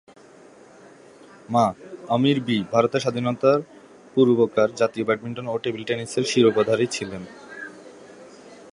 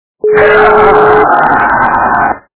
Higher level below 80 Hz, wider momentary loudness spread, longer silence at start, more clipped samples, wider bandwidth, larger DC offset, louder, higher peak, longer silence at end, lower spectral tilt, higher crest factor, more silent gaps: second, -64 dBFS vs -34 dBFS; first, 19 LU vs 5 LU; first, 1.5 s vs 0.25 s; second, under 0.1% vs 3%; first, 11.5 kHz vs 4 kHz; neither; second, -22 LUFS vs -7 LUFS; about the same, -2 dBFS vs 0 dBFS; about the same, 0.2 s vs 0.2 s; second, -5.5 dB/octave vs -9 dB/octave; first, 20 dB vs 8 dB; neither